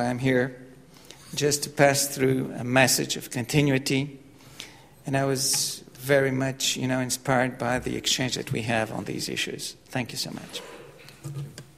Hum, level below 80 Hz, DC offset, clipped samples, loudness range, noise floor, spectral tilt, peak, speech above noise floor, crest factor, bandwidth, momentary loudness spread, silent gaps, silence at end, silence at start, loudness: none; -56 dBFS; under 0.1%; under 0.1%; 5 LU; -49 dBFS; -3.5 dB/octave; -4 dBFS; 23 dB; 22 dB; 16 kHz; 17 LU; none; 0.15 s; 0 s; -25 LUFS